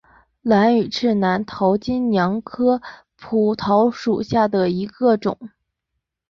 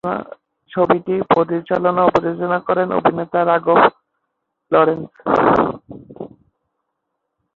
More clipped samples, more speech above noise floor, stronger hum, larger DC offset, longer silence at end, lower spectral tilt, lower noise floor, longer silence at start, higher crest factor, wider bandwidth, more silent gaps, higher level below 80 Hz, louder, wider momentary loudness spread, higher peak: neither; about the same, 60 dB vs 59 dB; neither; neither; second, 0.8 s vs 1.3 s; about the same, -7 dB/octave vs -8 dB/octave; about the same, -78 dBFS vs -75 dBFS; first, 0.45 s vs 0.05 s; about the same, 16 dB vs 18 dB; about the same, 7.2 kHz vs 7 kHz; neither; about the same, -54 dBFS vs -52 dBFS; about the same, -19 LUFS vs -17 LUFS; second, 7 LU vs 13 LU; second, -4 dBFS vs 0 dBFS